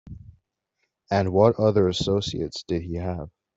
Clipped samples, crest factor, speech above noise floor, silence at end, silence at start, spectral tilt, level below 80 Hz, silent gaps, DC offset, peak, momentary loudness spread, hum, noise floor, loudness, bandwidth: under 0.1%; 20 dB; 54 dB; 0.3 s; 0.05 s; -6.5 dB/octave; -50 dBFS; none; under 0.1%; -4 dBFS; 12 LU; none; -77 dBFS; -23 LUFS; 8 kHz